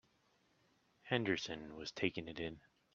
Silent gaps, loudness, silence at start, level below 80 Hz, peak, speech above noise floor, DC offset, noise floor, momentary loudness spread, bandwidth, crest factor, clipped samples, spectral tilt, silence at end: none; -41 LUFS; 1.05 s; -72 dBFS; -18 dBFS; 35 dB; under 0.1%; -76 dBFS; 11 LU; 7.6 kHz; 26 dB; under 0.1%; -5 dB/octave; 0.35 s